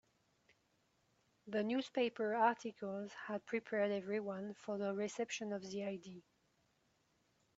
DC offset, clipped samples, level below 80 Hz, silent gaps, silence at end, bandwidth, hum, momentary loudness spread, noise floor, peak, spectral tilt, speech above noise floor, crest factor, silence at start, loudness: under 0.1%; under 0.1%; -86 dBFS; none; 1.4 s; 8 kHz; none; 10 LU; -79 dBFS; -20 dBFS; -4 dB/octave; 38 dB; 22 dB; 1.45 s; -41 LUFS